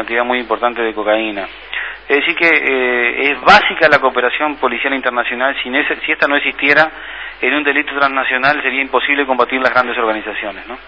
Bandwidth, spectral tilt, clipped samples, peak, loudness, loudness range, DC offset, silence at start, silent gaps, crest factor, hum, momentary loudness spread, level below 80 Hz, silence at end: 8 kHz; -4.5 dB/octave; 0.2%; 0 dBFS; -14 LUFS; 3 LU; 0.3%; 0 s; none; 14 dB; none; 10 LU; -48 dBFS; 0 s